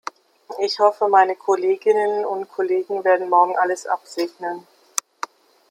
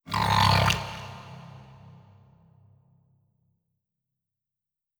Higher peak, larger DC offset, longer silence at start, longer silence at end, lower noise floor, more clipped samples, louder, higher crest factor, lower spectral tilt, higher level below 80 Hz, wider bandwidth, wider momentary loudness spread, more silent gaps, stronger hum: first, 0 dBFS vs -6 dBFS; neither; first, 0.5 s vs 0.05 s; second, 1.1 s vs 3.1 s; second, -39 dBFS vs -89 dBFS; neither; first, -20 LUFS vs -23 LUFS; about the same, 20 dB vs 24 dB; second, -2 dB/octave vs -4 dB/octave; second, -82 dBFS vs -46 dBFS; second, 16 kHz vs over 20 kHz; second, 17 LU vs 25 LU; neither; neither